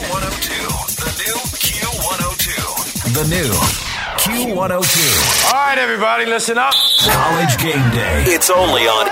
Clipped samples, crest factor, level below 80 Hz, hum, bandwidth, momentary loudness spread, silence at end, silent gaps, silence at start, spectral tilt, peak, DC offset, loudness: under 0.1%; 14 dB; -32 dBFS; none; 16.5 kHz; 8 LU; 0 s; none; 0 s; -2.5 dB/octave; -2 dBFS; under 0.1%; -14 LUFS